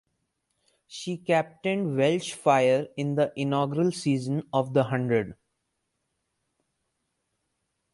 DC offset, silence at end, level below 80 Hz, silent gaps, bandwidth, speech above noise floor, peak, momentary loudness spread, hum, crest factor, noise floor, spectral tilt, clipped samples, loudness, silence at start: under 0.1%; 2.6 s; -68 dBFS; none; 11.5 kHz; 53 dB; -8 dBFS; 9 LU; none; 20 dB; -79 dBFS; -6 dB/octave; under 0.1%; -26 LUFS; 0.9 s